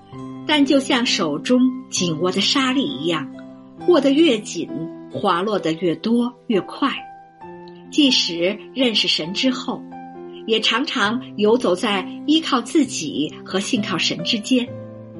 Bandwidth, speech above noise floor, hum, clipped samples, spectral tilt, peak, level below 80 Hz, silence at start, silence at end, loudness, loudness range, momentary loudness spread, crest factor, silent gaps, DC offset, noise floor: 11.5 kHz; 20 dB; none; under 0.1%; -3.5 dB/octave; -4 dBFS; -64 dBFS; 0.1 s; 0 s; -19 LUFS; 2 LU; 14 LU; 16 dB; none; under 0.1%; -39 dBFS